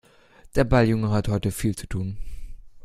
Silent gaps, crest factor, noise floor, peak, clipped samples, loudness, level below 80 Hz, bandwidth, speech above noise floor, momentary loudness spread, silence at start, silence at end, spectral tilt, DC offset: none; 22 dB; -52 dBFS; -4 dBFS; under 0.1%; -24 LUFS; -36 dBFS; 15 kHz; 30 dB; 14 LU; 0.45 s; 0.05 s; -6.5 dB/octave; under 0.1%